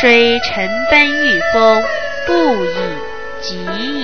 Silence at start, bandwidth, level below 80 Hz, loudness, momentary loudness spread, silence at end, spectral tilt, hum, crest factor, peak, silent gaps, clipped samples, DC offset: 0 s; 6.6 kHz; -42 dBFS; -13 LUFS; 14 LU; 0 s; -4 dB/octave; none; 14 dB; 0 dBFS; none; under 0.1%; 4%